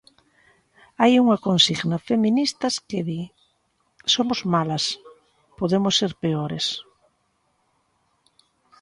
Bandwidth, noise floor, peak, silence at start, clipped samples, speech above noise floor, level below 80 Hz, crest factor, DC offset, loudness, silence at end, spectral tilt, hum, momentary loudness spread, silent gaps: 11.5 kHz; -69 dBFS; -4 dBFS; 1 s; under 0.1%; 48 dB; -62 dBFS; 20 dB; under 0.1%; -21 LUFS; 2 s; -4.5 dB/octave; none; 11 LU; none